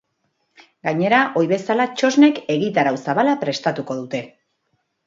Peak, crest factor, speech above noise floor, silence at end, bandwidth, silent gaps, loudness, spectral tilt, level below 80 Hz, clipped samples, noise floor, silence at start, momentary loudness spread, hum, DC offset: 0 dBFS; 18 dB; 52 dB; 0.8 s; 7.6 kHz; none; -19 LUFS; -5.5 dB/octave; -68 dBFS; under 0.1%; -70 dBFS; 0.85 s; 12 LU; none; under 0.1%